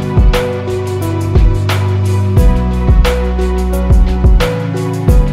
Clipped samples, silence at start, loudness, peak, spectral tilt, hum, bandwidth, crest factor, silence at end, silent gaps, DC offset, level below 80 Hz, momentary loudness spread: under 0.1%; 0 s; -13 LUFS; 0 dBFS; -7 dB/octave; none; 14.5 kHz; 10 dB; 0 s; none; under 0.1%; -12 dBFS; 5 LU